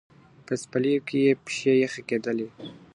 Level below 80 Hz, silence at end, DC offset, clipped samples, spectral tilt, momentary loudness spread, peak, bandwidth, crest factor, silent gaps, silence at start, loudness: -70 dBFS; 0.2 s; under 0.1%; under 0.1%; -5.5 dB/octave; 10 LU; -10 dBFS; 11 kHz; 16 dB; none; 0.5 s; -25 LUFS